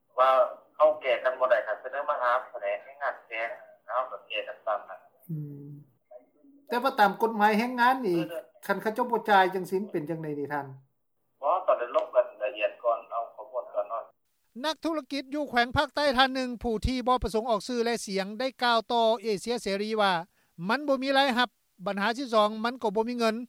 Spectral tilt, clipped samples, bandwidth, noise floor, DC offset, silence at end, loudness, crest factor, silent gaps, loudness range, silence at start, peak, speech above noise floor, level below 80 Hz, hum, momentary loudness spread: -4.5 dB/octave; under 0.1%; 17 kHz; -77 dBFS; under 0.1%; 0 s; -28 LUFS; 22 dB; none; 6 LU; 0.15 s; -6 dBFS; 50 dB; -52 dBFS; none; 12 LU